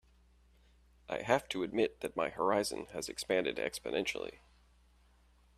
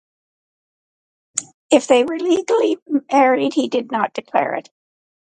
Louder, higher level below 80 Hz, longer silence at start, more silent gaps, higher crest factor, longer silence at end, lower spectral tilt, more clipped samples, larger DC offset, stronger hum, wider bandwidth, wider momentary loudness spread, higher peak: second, -35 LUFS vs -18 LUFS; about the same, -64 dBFS vs -68 dBFS; second, 1.1 s vs 1.35 s; second, none vs 1.54-1.69 s, 2.82-2.86 s; about the same, 24 dB vs 20 dB; first, 1.25 s vs 0.8 s; about the same, -3.5 dB/octave vs -3 dB/octave; neither; neither; neither; first, 14 kHz vs 11 kHz; second, 9 LU vs 12 LU; second, -14 dBFS vs 0 dBFS